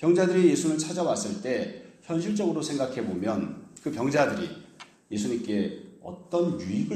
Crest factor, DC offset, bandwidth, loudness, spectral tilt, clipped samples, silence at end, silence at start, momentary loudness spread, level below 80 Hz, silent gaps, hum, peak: 20 dB; under 0.1%; 13 kHz; -28 LUFS; -5.5 dB/octave; under 0.1%; 0 s; 0 s; 15 LU; -66 dBFS; none; none; -8 dBFS